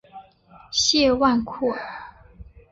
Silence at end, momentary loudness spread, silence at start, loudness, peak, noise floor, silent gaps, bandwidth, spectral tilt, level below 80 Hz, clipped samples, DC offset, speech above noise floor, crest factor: 0.3 s; 17 LU; 0.15 s; -21 LUFS; -6 dBFS; -51 dBFS; none; 8 kHz; -2.5 dB/octave; -48 dBFS; under 0.1%; under 0.1%; 30 dB; 18 dB